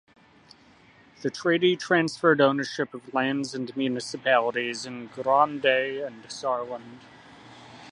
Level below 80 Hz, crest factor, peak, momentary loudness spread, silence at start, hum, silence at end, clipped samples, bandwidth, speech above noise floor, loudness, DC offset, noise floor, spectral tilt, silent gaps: -72 dBFS; 20 dB; -6 dBFS; 13 LU; 1.2 s; none; 0 s; under 0.1%; 11 kHz; 30 dB; -25 LUFS; under 0.1%; -56 dBFS; -4.5 dB/octave; none